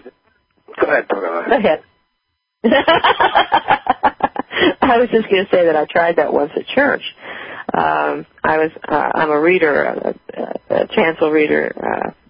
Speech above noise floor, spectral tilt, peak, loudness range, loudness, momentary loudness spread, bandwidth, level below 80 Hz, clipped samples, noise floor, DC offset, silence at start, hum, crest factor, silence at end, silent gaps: 56 dB; -10 dB/octave; 0 dBFS; 3 LU; -16 LUFS; 9 LU; 5.2 kHz; -50 dBFS; under 0.1%; -72 dBFS; under 0.1%; 0.05 s; none; 16 dB; 0.2 s; none